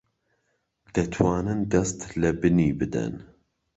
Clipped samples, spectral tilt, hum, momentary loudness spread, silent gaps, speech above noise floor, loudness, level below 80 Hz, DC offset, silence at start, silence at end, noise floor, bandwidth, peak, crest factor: under 0.1%; -6.5 dB/octave; none; 9 LU; none; 50 dB; -25 LUFS; -44 dBFS; under 0.1%; 0.95 s; 0.5 s; -74 dBFS; 8.2 kHz; -4 dBFS; 22 dB